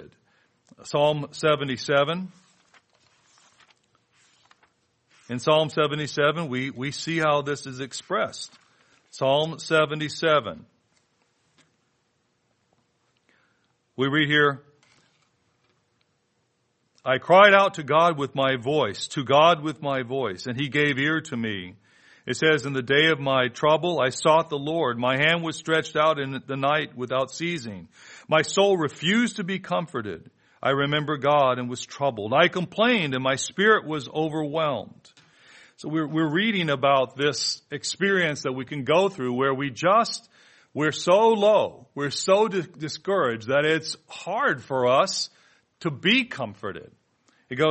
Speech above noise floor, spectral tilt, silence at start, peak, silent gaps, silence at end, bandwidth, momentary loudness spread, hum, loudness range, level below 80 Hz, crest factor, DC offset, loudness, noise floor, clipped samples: 48 dB; -4.5 dB/octave; 0 s; 0 dBFS; none; 0 s; 8.8 kHz; 13 LU; none; 6 LU; -68 dBFS; 24 dB; under 0.1%; -23 LUFS; -71 dBFS; under 0.1%